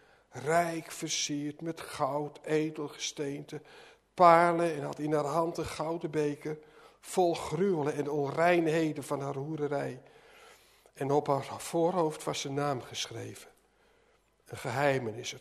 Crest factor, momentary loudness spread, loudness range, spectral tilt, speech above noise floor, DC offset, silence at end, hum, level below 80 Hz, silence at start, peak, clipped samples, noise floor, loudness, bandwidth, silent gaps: 24 dB; 14 LU; 6 LU; -5 dB/octave; 37 dB; under 0.1%; 0 s; none; -66 dBFS; 0.35 s; -8 dBFS; under 0.1%; -68 dBFS; -31 LUFS; 13.5 kHz; none